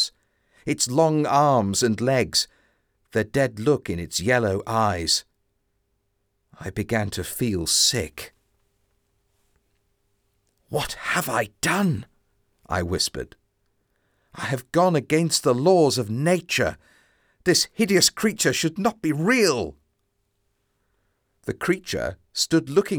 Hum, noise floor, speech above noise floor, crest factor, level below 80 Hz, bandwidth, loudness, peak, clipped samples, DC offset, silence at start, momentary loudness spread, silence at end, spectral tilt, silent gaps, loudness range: none; -72 dBFS; 50 dB; 18 dB; -52 dBFS; over 20 kHz; -22 LUFS; -6 dBFS; under 0.1%; under 0.1%; 0 s; 11 LU; 0 s; -4 dB/octave; none; 6 LU